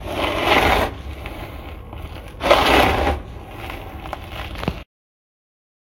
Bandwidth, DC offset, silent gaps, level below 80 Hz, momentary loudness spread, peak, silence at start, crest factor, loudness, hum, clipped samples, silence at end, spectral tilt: 17 kHz; under 0.1%; none; -32 dBFS; 20 LU; 0 dBFS; 0 s; 22 dB; -18 LUFS; none; under 0.1%; 1 s; -4.5 dB/octave